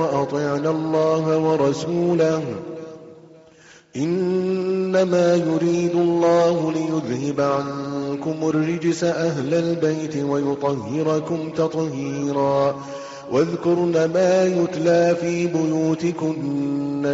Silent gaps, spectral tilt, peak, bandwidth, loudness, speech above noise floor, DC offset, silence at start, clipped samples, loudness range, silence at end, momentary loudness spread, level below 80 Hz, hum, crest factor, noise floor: none; -6.5 dB/octave; -8 dBFS; 7.8 kHz; -21 LUFS; 29 dB; under 0.1%; 0 s; under 0.1%; 3 LU; 0 s; 8 LU; -60 dBFS; none; 12 dB; -49 dBFS